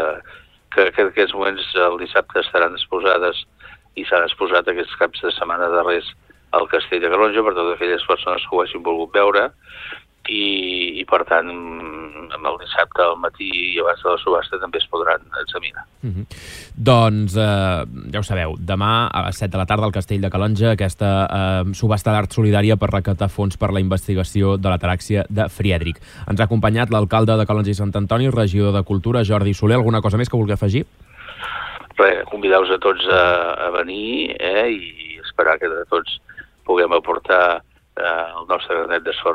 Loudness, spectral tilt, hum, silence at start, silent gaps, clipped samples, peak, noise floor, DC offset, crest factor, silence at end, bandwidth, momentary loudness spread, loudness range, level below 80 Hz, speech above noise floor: -18 LUFS; -6.5 dB/octave; none; 0 s; none; under 0.1%; -2 dBFS; -45 dBFS; under 0.1%; 16 dB; 0 s; 13.5 kHz; 12 LU; 3 LU; -42 dBFS; 27 dB